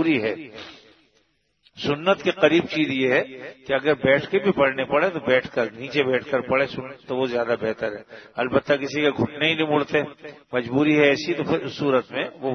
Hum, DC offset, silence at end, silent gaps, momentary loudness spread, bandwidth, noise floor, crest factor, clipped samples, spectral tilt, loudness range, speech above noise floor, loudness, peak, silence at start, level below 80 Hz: none; under 0.1%; 0 s; none; 11 LU; 6.6 kHz; -66 dBFS; 22 dB; under 0.1%; -6 dB/octave; 3 LU; 44 dB; -22 LUFS; -2 dBFS; 0 s; -60 dBFS